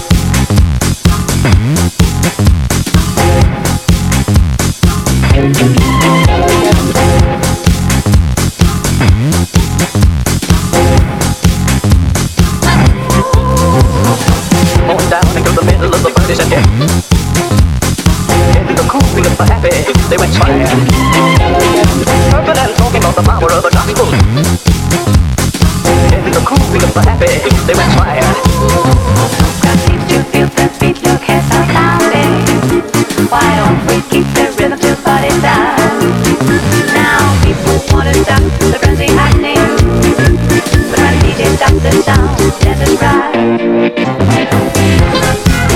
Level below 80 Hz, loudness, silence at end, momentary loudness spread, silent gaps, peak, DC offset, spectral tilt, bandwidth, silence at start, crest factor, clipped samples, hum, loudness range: -16 dBFS; -9 LUFS; 0 s; 3 LU; none; 0 dBFS; under 0.1%; -5.5 dB/octave; 17 kHz; 0 s; 8 dB; 0.6%; none; 2 LU